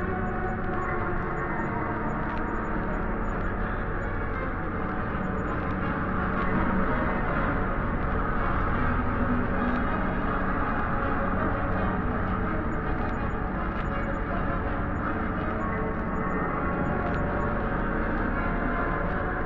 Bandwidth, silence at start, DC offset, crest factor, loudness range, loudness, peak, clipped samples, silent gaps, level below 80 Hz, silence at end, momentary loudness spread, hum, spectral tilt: 7.2 kHz; 0 s; under 0.1%; 16 dB; 3 LU; -29 LUFS; -12 dBFS; under 0.1%; none; -34 dBFS; 0 s; 3 LU; none; -9.5 dB/octave